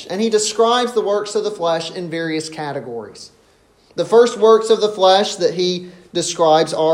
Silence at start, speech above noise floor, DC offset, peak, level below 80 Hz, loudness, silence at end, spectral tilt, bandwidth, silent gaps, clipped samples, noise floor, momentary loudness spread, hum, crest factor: 0 s; 37 dB; under 0.1%; 0 dBFS; -64 dBFS; -16 LUFS; 0 s; -3.5 dB/octave; 11.5 kHz; none; under 0.1%; -54 dBFS; 13 LU; none; 16 dB